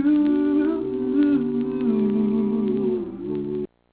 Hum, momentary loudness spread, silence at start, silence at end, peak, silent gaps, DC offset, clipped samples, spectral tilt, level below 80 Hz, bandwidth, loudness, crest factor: none; 9 LU; 0 s; 0.25 s; -10 dBFS; none; under 0.1%; under 0.1%; -8 dB/octave; -54 dBFS; 4 kHz; -22 LUFS; 12 dB